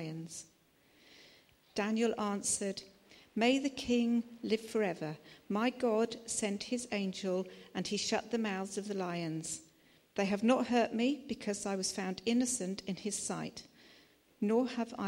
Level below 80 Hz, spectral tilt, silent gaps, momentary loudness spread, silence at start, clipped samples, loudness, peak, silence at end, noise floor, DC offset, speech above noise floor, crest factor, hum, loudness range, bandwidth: -72 dBFS; -4 dB/octave; none; 12 LU; 0 s; under 0.1%; -35 LUFS; -16 dBFS; 0 s; -68 dBFS; under 0.1%; 33 dB; 20 dB; none; 3 LU; 16.5 kHz